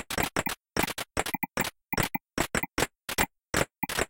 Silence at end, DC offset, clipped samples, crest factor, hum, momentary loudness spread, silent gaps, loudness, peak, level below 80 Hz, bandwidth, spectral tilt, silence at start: 0.05 s; under 0.1%; under 0.1%; 22 dB; none; 3 LU; none; -30 LUFS; -10 dBFS; -46 dBFS; 17 kHz; -3 dB/octave; 0 s